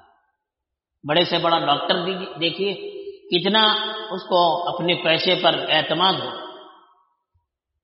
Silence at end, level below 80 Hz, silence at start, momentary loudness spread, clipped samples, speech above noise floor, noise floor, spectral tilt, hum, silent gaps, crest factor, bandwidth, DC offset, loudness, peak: 1.1 s; -68 dBFS; 1.05 s; 14 LU; under 0.1%; 63 dB; -84 dBFS; -1.5 dB/octave; none; none; 20 dB; 6 kHz; under 0.1%; -20 LUFS; -4 dBFS